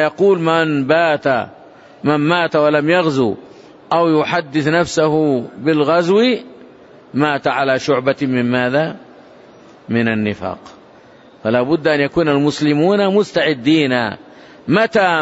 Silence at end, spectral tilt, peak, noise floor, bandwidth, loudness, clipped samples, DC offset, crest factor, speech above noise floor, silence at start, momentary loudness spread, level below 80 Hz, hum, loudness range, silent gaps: 0 s; -6 dB/octave; -2 dBFS; -44 dBFS; 8 kHz; -16 LUFS; under 0.1%; under 0.1%; 14 dB; 29 dB; 0 s; 9 LU; -54 dBFS; none; 4 LU; none